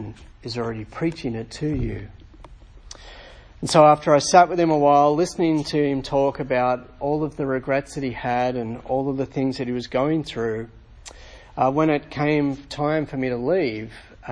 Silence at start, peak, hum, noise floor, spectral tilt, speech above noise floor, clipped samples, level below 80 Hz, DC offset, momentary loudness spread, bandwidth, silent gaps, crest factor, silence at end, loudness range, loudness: 0 s; -2 dBFS; none; -44 dBFS; -5.5 dB/octave; 23 dB; under 0.1%; -46 dBFS; under 0.1%; 19 LU; 10.5 kHz; none; 20 dB; 0 s; 8 LU; -22 LUFS